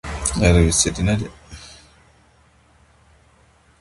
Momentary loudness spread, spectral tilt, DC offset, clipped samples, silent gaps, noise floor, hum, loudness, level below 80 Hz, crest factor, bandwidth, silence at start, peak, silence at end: 25 LU; -4.5 dB/octave; under 0.1%; under 0.1%; none; -55 dBFS; none; -18 LUFS; -30 dBFS; 22 dB; 11.5 kHz; 0.05 s; 0 dBFS; 2.1 s